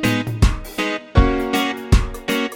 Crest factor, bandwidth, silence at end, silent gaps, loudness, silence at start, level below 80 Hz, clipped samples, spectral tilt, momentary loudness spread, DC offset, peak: 16 dB; 17 kHz; 0 s; none; -20 LUFS; 0 s; -22 dBFS; under 0.1%; -5.5 dB/octave; 5 LU; under 0.1%; -2 dBFS